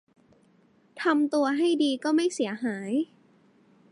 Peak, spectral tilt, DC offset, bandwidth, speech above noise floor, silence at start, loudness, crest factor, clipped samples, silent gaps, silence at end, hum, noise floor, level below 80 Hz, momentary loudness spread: -12 dBFS; -4 dB/octave; under 0.1%; 11.5 kHz; 37 dB; 0.95 s; -26 LUFS; 16 dB; under 0.1%; none; 0.85 s; none; -62 dBFS; -80 dBFS; 6 LU